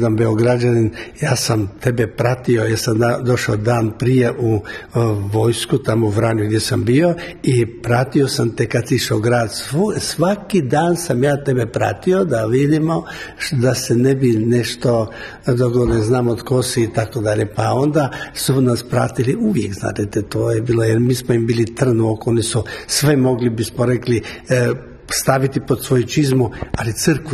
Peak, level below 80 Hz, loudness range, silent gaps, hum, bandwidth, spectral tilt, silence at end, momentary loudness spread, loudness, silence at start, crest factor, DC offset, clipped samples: 0 dBFS; -42 dBFS; 1 LU; none; none; 13.5 kHz; -6 dB/octave; 0 s; 5 LU; -17 LUFS; 0 s; 16 dB; under 0.1%; under 0.1%